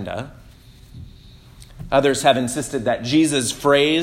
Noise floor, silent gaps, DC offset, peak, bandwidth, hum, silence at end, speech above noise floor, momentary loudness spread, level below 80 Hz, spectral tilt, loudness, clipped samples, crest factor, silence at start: -45 dBFS; none; under 0.1%; 0 dBFS; 16.5 kHz; none; 0 s; 27 dB; 15 LU; -46 dBFS; -4 dB/octave; -19 LUFS; under 0.1%; 20 dB; 0 s